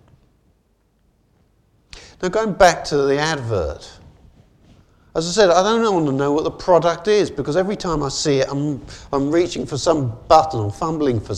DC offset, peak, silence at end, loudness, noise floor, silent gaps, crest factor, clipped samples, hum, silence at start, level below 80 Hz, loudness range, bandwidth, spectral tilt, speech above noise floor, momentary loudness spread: under 0.1%; 0 dBFS; 0 s; -18 LUFS; -62 dBFS; none; 20 dB; under 0.1%; none; 1.95 s; -42 dBFS; 3 LU; 13 kHz; -5 dB/octave; 44 dB; 10 LU